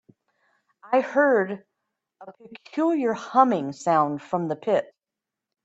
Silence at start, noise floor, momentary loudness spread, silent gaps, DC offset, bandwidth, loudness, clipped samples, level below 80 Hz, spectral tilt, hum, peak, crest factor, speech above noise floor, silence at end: 0.85 s; -87 dBFS; 12 LU; none; under 0.1%; 8.2 kHz; -23 LUFS; under 0.1%; -76 dBFS; -6.5 dB/octave; none; -4 dBFS; 22 dB; 64 dB; 0.8 s